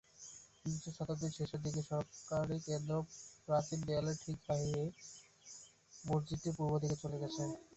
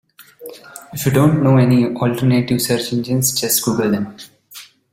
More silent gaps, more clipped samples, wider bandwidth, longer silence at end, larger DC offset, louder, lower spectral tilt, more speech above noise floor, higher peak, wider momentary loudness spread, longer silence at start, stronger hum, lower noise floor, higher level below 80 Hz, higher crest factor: neither; neither; second, 8.2 kHz vs 16.5 kHz; second, 0 s vs 0.3 s; neither; second, -40 LUFS vs -16 LUFS; about the same, -6 dB/octave vs -5 dB/octave; second, 20 dB vs 25 dB; second, -22 dBFS vs -2 dBFS; second, 16 LU vs 23 LU; about the same, 0.2 s vs 0.2 s; neither; first, -59 dBFS vs -41 dBFS; second, -64 dBFS vs -50 dBFS; about the same, 18 dB vs 16 dB